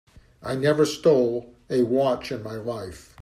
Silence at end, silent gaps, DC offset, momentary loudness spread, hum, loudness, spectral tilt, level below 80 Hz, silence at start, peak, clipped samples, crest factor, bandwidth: 0 s; none; under 0.1%; 14 LU; none; -24 LUFS; -6 dB/octave; -56 dBFS; 0.4 s; -8 dBFS; under 0.1%; 16 dB; 14.5 kHz